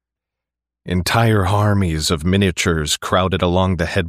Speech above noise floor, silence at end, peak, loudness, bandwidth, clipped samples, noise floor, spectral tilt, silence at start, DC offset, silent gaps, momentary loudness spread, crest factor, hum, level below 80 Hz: 68 dB; 0 s; -4 dBFS; -17 LUFS; 15.5 kHz; under 0.1%; -85 dBFS; -5 dB/octave; 0.85 s; under 0.1%; none; 3 LU; 14 dB; none; -36 dBFS